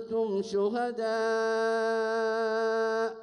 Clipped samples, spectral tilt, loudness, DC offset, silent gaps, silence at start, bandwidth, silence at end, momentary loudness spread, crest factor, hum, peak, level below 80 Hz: under 0.1%; -4.5 dB/octave; -29 LUFS; under 0.1%; none; 0 s; 10 kHz; 0 s; 2 LU; 10 dB; none; -18 dBFS; -74 dBFS